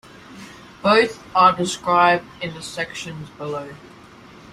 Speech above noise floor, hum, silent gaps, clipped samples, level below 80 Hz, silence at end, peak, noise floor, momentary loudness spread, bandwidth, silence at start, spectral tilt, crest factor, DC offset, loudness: 24 dB; none; none; under 0.1%; -58 dBFS; 0.65 s; -2 dBFS; -44 dBFS; 23 LU; 14 kHz; 0.3 s; -4 dB/octave; 20 dB; under 0.1%; -19 LUFS